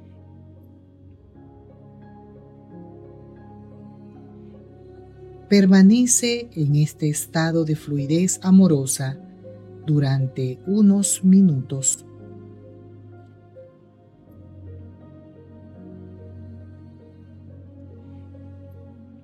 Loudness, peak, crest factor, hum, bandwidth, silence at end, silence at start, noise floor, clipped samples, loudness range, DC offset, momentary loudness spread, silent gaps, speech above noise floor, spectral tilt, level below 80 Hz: -19 LUFS; -4 dBFS; 20 dB; none; 14 kHz; 0.4 s; 2.75 s; -51 dBFS; under 0.1%; 17 LU; under 0.1%; 28 LU; none; 34 dB; -5.5 dB/octave; -58 dBFS